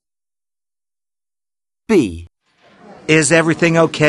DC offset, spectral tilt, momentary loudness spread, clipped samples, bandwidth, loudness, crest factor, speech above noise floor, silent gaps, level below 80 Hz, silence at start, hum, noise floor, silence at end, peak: under 0.1%; -4.5 dB/octave; 15 LU; under 0.1%; 12 kHz; -14 LUFS; 18 dB; over 77 dB; none; -48 dBFS; 1.9 s; none; under -90 dBFS; 0 s; 0 dBFS